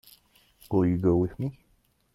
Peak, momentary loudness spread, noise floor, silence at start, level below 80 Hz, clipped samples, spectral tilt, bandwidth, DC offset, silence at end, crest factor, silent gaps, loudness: -12 dBFS; 12 LU; -67 dBFS; 0.7 s; -54 dBFS; under 0.1%; -10 dB/octave; 15.5 kHz; under 0.1%; 0.6 s; 16 dB; none; -27 LUFS